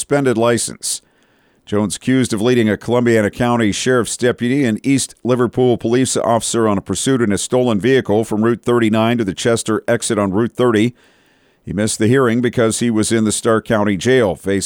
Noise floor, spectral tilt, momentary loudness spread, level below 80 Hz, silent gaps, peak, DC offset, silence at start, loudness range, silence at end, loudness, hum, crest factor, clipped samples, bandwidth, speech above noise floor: -56 dBFS; -5 dB/octave; 4 LU; -48 dBFS; none; -4 dBFS; under 0.1%; 0 s; 1 LU; 0 s; -16 LUFS; none; 12 dB; under 0.1%; 17.5 kHz; 40 dB